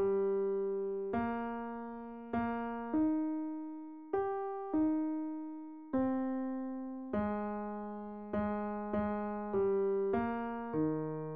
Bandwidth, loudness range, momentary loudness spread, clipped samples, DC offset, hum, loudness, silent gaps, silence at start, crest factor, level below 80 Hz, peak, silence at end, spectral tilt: 3.8 kHz; 2 LU; 10 LU; under 0.1%; 0.1%; none; -36 LUFS; none; 0 s; 14 dB; -64 dBFS; -22 dBFS; 0 s; -8 dB/octave